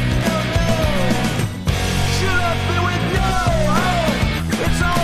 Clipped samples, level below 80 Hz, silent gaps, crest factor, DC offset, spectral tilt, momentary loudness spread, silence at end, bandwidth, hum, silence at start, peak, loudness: under 0.1%; -26 dBFS; none; 14 dB; under 0.1%; -5 dB/octave; 3 LU; 0 s; 15.5 kHz; none; 0 s; -4 dBFS; -18 LUFS